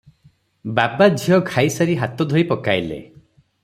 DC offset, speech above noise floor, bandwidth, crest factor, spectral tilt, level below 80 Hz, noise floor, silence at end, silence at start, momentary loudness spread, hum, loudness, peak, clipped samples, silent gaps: under 0.1%; 38 dB; 15.5 kHz; 18 dB; -6 dB/octave; -56 dBFS; -56 dBFS; 0.6 s; 0.65 s; 11 LU; none; -18 LUFS; -2 dBFS; under 0.1%; none